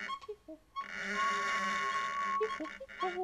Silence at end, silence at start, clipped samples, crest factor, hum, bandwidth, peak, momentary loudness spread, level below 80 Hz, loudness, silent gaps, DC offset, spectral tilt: 0 s; 0 s; under 0.1%; 14 dB; none; 14 kHz; -22 dBFS; 12 LU; -68 dBFS; -35 LUFS; none; under 0.1%; -2.5 dB/octave